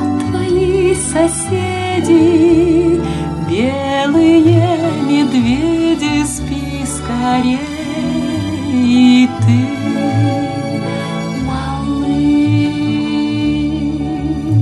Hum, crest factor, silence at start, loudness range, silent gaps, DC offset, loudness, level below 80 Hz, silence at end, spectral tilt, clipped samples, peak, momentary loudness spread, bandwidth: none; 14 dB; 0 s; 4 LU; none; under 0.1%; -14 LUFS; -34 dBFS; 0 s; -6 dB/octave; under 0.1%; 0 dBFS; 10 LU; 12.5 kHz